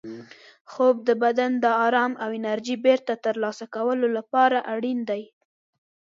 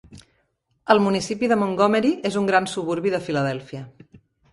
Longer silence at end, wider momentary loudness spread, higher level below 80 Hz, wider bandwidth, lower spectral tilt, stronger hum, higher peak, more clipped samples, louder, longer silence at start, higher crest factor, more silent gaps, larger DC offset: first, 0.9 s vs 0.35 s; second, 9 LU vs 13 LU; second, -80 dBFS vs -60 dBFS; second, 7.6 kHz vs 11.5 kHz; about the same, -5 dB/octave vs -5.5 dB/octave; neither; second, -6 dBFS vs -2 dBFS; neither; about the same, -23 LUFS vs -21 LUFS; about the same, 0.05 s vs 0.1 s; about the same, 18 dB vs 22 dB; first, 0.61-0.65 s vs none; neither